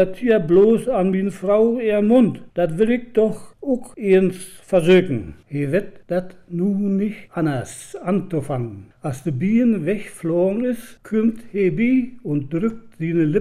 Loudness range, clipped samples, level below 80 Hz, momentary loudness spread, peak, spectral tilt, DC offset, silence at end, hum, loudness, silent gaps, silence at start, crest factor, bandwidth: 6 LU; under 0.1%; -50 dBFS; 12 LU; -4 dBFS; -7.5 dB/octave; under 0.1%; 0 s; none; -20 LUFS; none; 0 s; 14 dB; 14 kHz